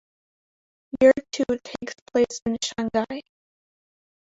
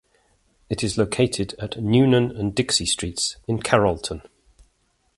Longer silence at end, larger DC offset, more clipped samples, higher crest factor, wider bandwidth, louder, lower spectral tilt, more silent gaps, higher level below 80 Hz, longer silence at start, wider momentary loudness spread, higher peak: first, 1.15 s vs 0.95 s; neither; neither; about the same, 20 dB vs 22 dB; second, 8 kHz vs 11.5 kHz; about the same, -23 LUFS vs -22 LUFS; about the same, -4 dB/octave vs -4.5 dB/octave; first, 2.02-2.06 s, 2.42-2.46 s vs none; second, -58 dBFS vs -46 dBFS; first, 0.95 s vs 0.7 s; first, 17 LU vs 11 LU; second, -4 dBFS vs 0 dBFS